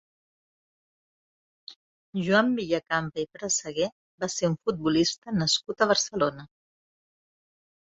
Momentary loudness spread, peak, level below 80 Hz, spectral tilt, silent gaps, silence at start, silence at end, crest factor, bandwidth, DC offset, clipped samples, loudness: 12 LU; -8 dBFS; -62 dBFS; -3.5 dB/octave; 1.76-2.13 s, 3.92-4.18 s, 5.18-5.22 s; 1.7 s; 1.4 s; 20 dB; 8.2 kHz; under 0.1%; under 0.1%; -26 LUFS